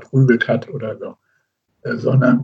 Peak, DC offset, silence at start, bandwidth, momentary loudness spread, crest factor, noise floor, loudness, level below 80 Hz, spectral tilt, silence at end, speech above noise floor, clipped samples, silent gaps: -2 dBFS; under 0.1%; 0 s; 6.2 kHz; 18 LU; 16 dB; -67 dBFS; -18 LUFS; -68 dBFS; -9 dB/octave; 0 s; 51 dB; under 0.1%; none